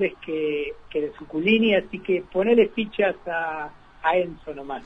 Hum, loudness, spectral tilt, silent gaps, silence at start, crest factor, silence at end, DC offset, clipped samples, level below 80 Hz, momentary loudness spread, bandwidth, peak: none; -24 LUFS; -7.5 dB/octave; none; 0 s; 18 dB; 0 s; under 0.1%; under 0.1%; -54 dBFS; 12 LU; 5.6 kHz; -6 dBFS